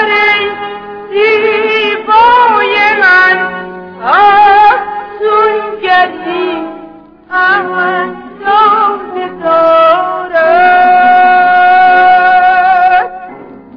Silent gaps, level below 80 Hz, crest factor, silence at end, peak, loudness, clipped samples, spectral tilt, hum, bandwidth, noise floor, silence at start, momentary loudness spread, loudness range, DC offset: none; -48 dBFS; 8 dB; 0.2 s; 0 dBFS; -8 LUFS; 0.1%; -5 dB/octave; none; 5.4 kHz; -33 dBFS; 0 s; 14 LU; 6 LU; under 0.1%